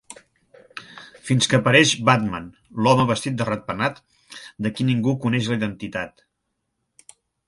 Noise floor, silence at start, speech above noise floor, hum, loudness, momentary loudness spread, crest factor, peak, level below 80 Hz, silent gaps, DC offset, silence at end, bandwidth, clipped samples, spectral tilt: -76 dBFS; 0.1 s; 56 dB; none; -20 LUFS; 24 LU; 22 dB; 0 dBFS; -56 dBFS; none; under 0.1%; 1.4 s; 11.5 kHz; under 0.1%; -4.5 dB/octave